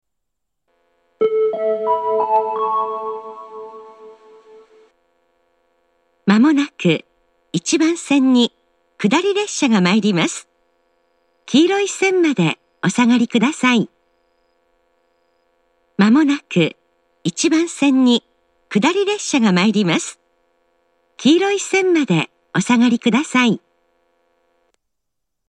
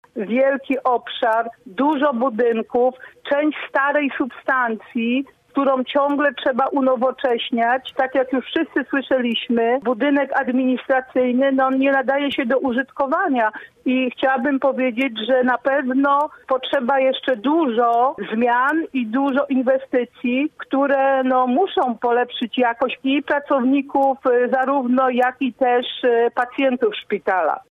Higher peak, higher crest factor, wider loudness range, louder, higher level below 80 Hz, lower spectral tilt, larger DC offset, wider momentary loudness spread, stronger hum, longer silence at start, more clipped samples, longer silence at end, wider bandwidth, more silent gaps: first, 0 dBFS vs -8 dBFS; first, 18 dB vs 12 dB; first, 5 LU vs 2 LU; about the same, -17 LUFS vs -19 LUFS; second, -72 dBFS vs -66 dBFS; second, -4.5 dB/octave vs -6.5 dB/octave; neither; first, 10 LU vs 5 LU; neither; first, 1.2 s vs 0.15 s; neither; first, 1.9 s vs 0.15 s; first, 10.5 kHz vs 4.5 kHz; neither